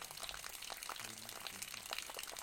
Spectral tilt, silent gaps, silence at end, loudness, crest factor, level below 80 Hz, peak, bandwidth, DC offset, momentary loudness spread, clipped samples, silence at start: 0 dB/octave; none; 0 s; -46 LUFS; 24 dB; -70 dBFS; -24 dBFS; 17 kHz; under 0.1%; 3 LU; under 0.1%; 0 s